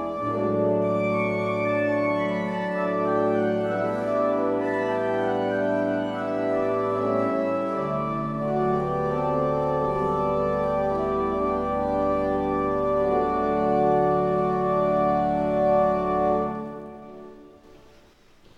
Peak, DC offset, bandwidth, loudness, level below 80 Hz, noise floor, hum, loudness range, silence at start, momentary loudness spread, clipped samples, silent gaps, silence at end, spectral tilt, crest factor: -10 dBFS; under 0.1%; 9 kHz; -24 LUFS; -48 dBFS; -54 dBFS; none; 3 LU; 0 s; 5 LU; under 0.1%; none; 0.8 s; -8.5 dB/octave; 14 dB